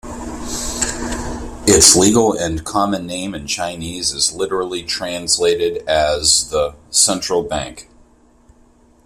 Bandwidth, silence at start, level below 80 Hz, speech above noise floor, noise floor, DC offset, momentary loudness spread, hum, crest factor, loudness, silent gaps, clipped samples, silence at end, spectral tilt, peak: 16 kHz; 0.05 s; -36 dBFS; 34 dB; -51 dBFS; under 0.1%; 14 LU; none; 18 dB; -16 LUFS; none; under 0.1%; 1.25 s; -2.5 dB/octave; 0 dBFS